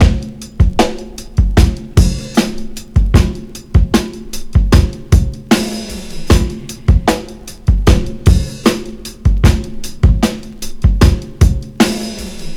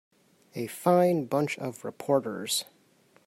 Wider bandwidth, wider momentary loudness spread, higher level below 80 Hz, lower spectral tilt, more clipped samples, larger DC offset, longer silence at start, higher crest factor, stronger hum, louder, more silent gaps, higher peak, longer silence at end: about the same, 16 kHz vs 16 kHz; about the same, 14 LU vs 14 LU; first, -16 dBFS vs -78 dBFS; about the same, -6 dB/octave vs -5 dB/octave; neither; neither; second, 0 s vs 0.55 s; second, 12 dB vs 20 dB; neither; first, -15 LUFS vs -28 LUFS; neither; first, 0 dBFS vs -10 dBFS; second, 0 s vs 0.65 s